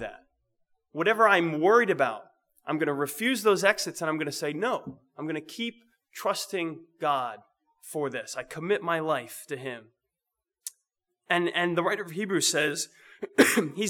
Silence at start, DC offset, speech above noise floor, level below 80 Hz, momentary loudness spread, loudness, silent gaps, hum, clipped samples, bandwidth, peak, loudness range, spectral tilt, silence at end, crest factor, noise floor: 0 s; under 0.1%; 60 dB; -74 dBFS; 19 LU; -27 LUFS; none; none; under 0.1%; over 20 kHz; -4 dBFS; 8 LU; -3.5 dB/octave; 0 s; 24 dB; -88 dBFS